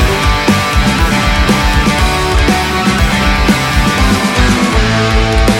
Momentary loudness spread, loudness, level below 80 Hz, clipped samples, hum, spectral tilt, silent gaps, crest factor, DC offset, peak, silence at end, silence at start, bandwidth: 1 LU; -11 LUFS; -16 dBFS; under 0.1%; none; -4.5 dB/octave; none; 10 dB; under 0.1%; 0 dBFS; 0 s; 0 s; 17 kHz